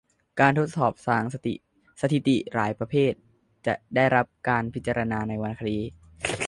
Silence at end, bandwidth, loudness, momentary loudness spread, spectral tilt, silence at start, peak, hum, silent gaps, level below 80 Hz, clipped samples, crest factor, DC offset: 0 s; 11.5 kHz; -26 LUFS; 11 LU; -6 dB/octave; 0.35 s; -6 dBFS; none; none; -54 dBFS; under 0.1%; 20 dB; under 0.1%